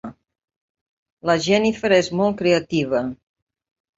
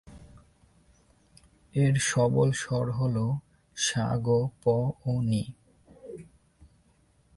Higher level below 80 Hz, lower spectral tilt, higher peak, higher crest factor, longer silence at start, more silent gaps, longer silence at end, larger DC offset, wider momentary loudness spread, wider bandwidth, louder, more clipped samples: about the same, -56 dBFS vs -56 dBFS; about the same, -5 dB/octave vs -5.5 dB/octave; first, -2 dBFS vs -12 dBFS; about the same, 20 dB vs 16 dB; about the same, 0.05 s vs 0.05 s; first, 0.56-0.75 s, 0.81-1.06 s, 1.12-1.17 s vs none; second, 0.85 s vs 1.15 s; neither; second, 10 LU vs 19 LU; second, 8 kHz vs 11.5 kHz; first, -20 LUFS vs -27 LUFS; neither